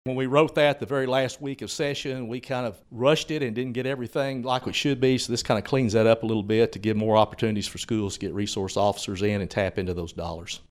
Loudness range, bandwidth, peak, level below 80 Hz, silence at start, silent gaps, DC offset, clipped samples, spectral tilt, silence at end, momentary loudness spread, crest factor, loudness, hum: 4 LU; 15 kHz; -4 dBFS; -52 dBFS; 0.05 s; none; under 0.1%; under 0.1%; -5 dB/octave; 0.15 s; 10 LU; 20 dB; -25 LUFS; none